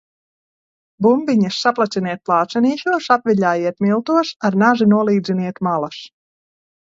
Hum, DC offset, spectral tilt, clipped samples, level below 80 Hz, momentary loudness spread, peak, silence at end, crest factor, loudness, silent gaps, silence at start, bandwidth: none; under 0.1%; -6.5 dB/octave; under 0.1%; -64 dBFS; 6 LU; 0 dBFS; 0.75 s; 18 dB; -17 LUFS; none; 1 s; 7.6 kHz